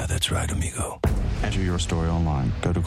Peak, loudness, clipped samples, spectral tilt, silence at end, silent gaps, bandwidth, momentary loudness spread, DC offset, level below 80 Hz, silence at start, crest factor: -8 dBFS; -25 LUFS; under 0.1%; -5 dB/octave; 0 s; none; 15 kHz; 3 LU; under 0.1%; -30 dBFS; 0 s; 16 dB